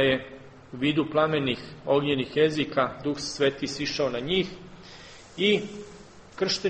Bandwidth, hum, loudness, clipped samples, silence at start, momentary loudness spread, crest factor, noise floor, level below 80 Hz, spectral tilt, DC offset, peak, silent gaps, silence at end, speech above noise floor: 8.4 kHz; none; -26 LUFS; under 0.1%; 0 s; 21 LU; 18 dB; -47 dBFS; -56 dBFS; -4.5 dB/octave; under 0.1%; -8 dBFS; none; 0 s; 21 dB